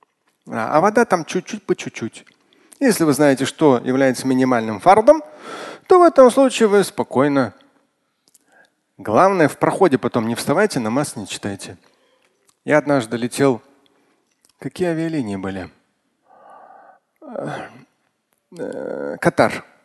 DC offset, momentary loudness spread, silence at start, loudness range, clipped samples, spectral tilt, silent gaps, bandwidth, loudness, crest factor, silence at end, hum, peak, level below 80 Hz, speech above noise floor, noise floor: under 0.1%; 20 LU; 0.45 s; 13 LU; under 0.1%; -5.5 dB/octave; none; 12.5 kHz; -17 LUFS; 18 dB; 0.25 s; none; 0 dBFS; -58 dBFS; 51 dB; -68 dBFS